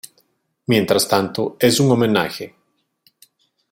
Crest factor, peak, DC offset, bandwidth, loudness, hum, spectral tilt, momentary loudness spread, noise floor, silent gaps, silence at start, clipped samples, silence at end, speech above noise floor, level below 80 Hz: 18 dB; -2 dBFS; under 0.1%; 16.5 kHz; -17 LUFS; none; -4.5 dB/octave; 16 LU; -67 dBFS; none; 0.7 s; under 0.1%; 1.25 s; 50 dB; -58 dBFS